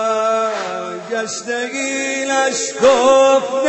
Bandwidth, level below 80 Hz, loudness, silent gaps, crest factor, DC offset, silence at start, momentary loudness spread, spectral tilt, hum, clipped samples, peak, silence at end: 8.6 kHz; -58 dBFS; -16 LUFS; none; 16 dB; under 0.1%; 0 s; 12 LU; -2 dB/octave; none; under 0.1%; 0 dBFS; 0 s